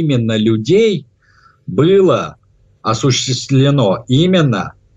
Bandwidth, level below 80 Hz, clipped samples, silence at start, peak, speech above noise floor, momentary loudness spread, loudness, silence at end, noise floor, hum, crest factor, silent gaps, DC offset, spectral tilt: 8 kHz; -50 dBFS; under 0.1%; 0 s; -2 dBFS; 38 dB; 10 LU; -14 LUFS; 0.25 s; -50 dBFS; none; 12 dB; none; under 0.1%; -6 dB/octave